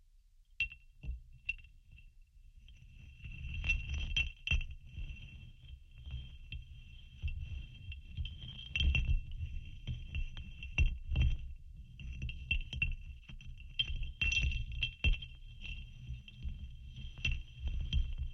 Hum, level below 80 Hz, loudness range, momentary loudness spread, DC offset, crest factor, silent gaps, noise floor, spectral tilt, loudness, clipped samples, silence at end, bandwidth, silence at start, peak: none; -40 dBFS; 8 LU; 18 LU; under 0.1%; 20 dB; none; -64 dBFS; -4 dB/octave; -39 LUFS; under 0.1%; 0 s; 6.8 kHz; 0.15 s; -20 dBFS